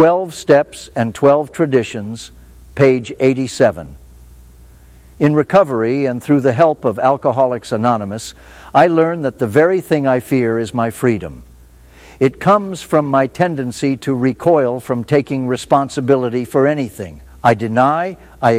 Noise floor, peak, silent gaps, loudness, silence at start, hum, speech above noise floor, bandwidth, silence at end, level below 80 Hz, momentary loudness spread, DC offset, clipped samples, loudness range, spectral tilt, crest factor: -43 dBFS; 0 dBFS; none; -16 LUFS; 0 s; none; 28 dB; 15.5 kHz; 0 s; -46 dBFS; 10 LU; under 0.1%; under 0.1%; 2 LU; -6.5 dB/octave; 16 dB